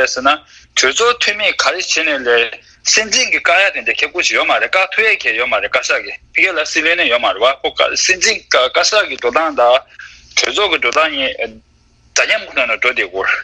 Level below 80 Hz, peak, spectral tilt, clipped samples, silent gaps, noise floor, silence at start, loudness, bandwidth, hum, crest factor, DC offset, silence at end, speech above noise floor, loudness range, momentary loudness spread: -50 dBFS; 0 dBFS; 0.5 dB/octave; under 0.1%; none; -51 dBFS; 0 s; -13 LUFS; 9.8 kHz; none; 14 dB; under 0.1%; 0 s; 36 dB; 3 LU; 5 LU